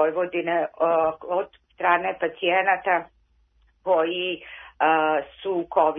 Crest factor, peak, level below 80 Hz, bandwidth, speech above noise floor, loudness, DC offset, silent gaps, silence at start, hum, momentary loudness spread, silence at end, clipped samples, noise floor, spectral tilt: 20 dB; -4 dBFS; -64 dBFS; 3.8 kHz; 39 dB; -23 LUFS; under 0.1%; none; 0 s; none; 8 LU; 0 s; under 0.1%; -62 dBFS; -8 dB/octave